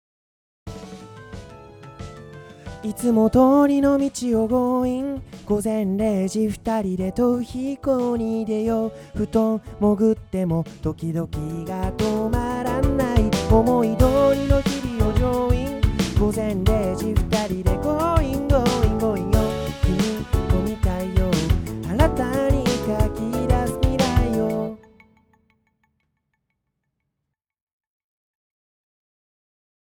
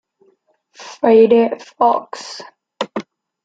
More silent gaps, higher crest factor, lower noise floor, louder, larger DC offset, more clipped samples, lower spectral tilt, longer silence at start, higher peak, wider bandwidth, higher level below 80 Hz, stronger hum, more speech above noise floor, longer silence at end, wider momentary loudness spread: neither; about the same, 20 dB vs 16 dB; first, -81 dBFS vs -59 dBFS; second, -21 LUFS vs -15 LUFS; neither; neither; first, -7 dB/octave vs -5.5 dB/octave; second, 0.65 s vs 0.8 s; about the same, -2 dBFS vs -2 dBFS; first, over 20 kHz vs 7.8 kHz; first, -30 dBFS vs -66 dBFS; neither; first, 61 dB vs 45 dB; first, 5.2 s vs 0.45 s; second, 11 LU vs 22 LU